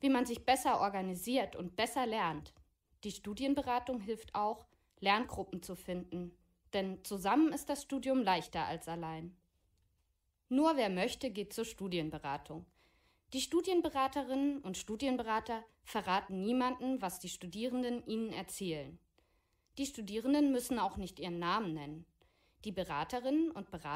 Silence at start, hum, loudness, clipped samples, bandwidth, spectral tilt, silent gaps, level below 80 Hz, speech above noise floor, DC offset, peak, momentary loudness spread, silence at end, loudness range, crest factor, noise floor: 0 s; none; -37 LUFS; under 0.1%; 16 kHz; -4.5 dB/octave; none; -64 dBFS; 44 dB; under 0.1%; -18 dBFS; 13 LU; 0 s; 3 LU; 18 dB; -80 dBFS